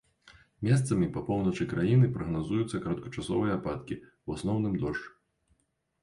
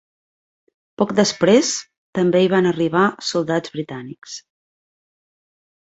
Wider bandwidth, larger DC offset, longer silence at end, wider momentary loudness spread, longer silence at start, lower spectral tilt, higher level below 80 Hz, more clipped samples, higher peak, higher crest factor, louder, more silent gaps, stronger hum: first, 11.5 kHz vs 8.2 kHz; neither; second, 0.95 s vs 1.45 s; second, 13 LU vs 18 LU; second, 0.25 s vs 1 s; first, -7.5 dB/octave vs -4.5 dB/octave; first, -52 dBFS vs -62 dBFS; neither; second, -14 dBFS vs -2 dBFS; about the same, 16 dB vs 18 dB; second, -30 LUFS vs -18 LUFS; second, none vs 1.98-2.13 s; neither